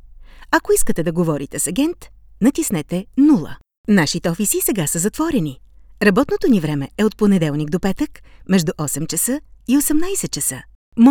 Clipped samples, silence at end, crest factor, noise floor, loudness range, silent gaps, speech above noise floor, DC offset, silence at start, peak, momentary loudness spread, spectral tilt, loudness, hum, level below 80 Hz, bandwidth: under 0.1%; 0 s; 18 dB; -40 dBFS; 2 LU; 3.78-3.84 s, 10.75-10.92 s; 22 dB; under 0.1%; 0.05 s; 0 dBFS; 8 LU; -4.5 dB/octave; -18 LUFS; none; -40 dBFS; over 20 kHz